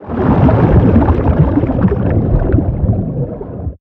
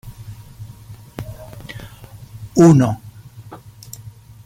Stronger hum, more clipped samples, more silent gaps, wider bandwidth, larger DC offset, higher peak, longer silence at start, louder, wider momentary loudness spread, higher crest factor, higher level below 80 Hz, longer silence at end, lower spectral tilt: neither; neither; neither; second, 4.2 kHz vs 16 kHz; neither; about the same, 0 dBFS vs -2 dBFS; about the same, 0 s vs 0.05 s; about the same, -13 LUFS vs -14 LUFS; second, 11 LU vs 29 LU; second, 12 dB vs 18 dB; first, -18 dBFS vs -46 dBFS; second, 0.1 s vs 0.9 s; first, -12 dB/octave vs -7.5 dB/octave